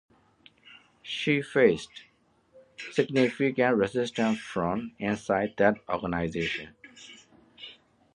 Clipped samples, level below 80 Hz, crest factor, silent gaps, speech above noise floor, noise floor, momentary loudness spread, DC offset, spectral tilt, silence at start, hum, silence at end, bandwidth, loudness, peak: under 0.1%; -58 dBFS; 22 dB; none; 35 dB; -62 dBFS; 22 LU; under 0.1%; -5.5 dB/octave; 0.7 s; none; 0.45 s; 11 kHz; -27 LUFS; -6 dBFS